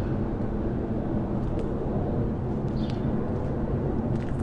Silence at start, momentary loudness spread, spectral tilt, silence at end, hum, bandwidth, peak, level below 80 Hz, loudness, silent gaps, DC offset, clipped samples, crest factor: 0 s; 2 LU; -10 dB/octave; 0 s; none; 7.8 kHz; -16 dBFS; -36 dBFS; -29 LUFS; none; under 0.1%; under 0.1%; 12 dB